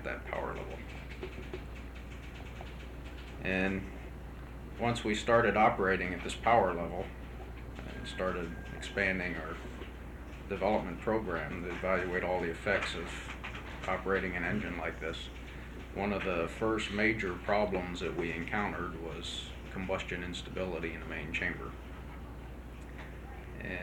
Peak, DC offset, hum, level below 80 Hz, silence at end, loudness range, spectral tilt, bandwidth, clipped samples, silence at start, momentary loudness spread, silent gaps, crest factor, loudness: -14 dBFS; under 0.1%; none; -46 dBFS; 0 s; 9 LU; -5.5 dB/octave; 18.5 kHz; under 0.1%; 0 s; 16 LU; none; 22 dB; -34 LUFS